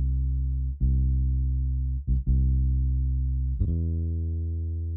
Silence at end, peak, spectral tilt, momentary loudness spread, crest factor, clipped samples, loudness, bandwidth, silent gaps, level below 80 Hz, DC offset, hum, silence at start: 0 s; -14 dBFS; -17.5 dB/octave; 5 LU; 12 dB; under 0.1%; -27 LUFS; 0.6 kHz; none; -26 dBFS; under 0.1%; none; 0 s